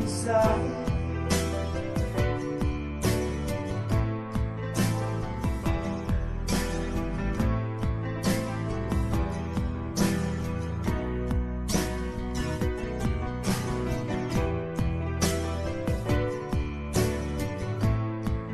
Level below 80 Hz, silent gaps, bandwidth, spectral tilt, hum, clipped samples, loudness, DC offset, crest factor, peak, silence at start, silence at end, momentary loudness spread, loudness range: -34 dBFS; none; 13 kHz; -6 dB/octave; none; under 0.1%; -29 LUFS; under 0.1%; 18 dB; -10 dBFS; 0 s; 0 s; 4 LU; 1 LU